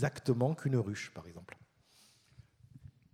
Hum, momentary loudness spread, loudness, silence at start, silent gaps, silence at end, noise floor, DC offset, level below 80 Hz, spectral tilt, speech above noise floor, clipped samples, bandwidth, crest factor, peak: none; 25 LU; -34 LUFS; 0 s; none; 0.25 s; -66 dBFS; under 0.1%; -70 dBFS; -7 dB/octave; 32 dB; under 0.1%; 13.5 kHz; 20 dB; -18 dBFS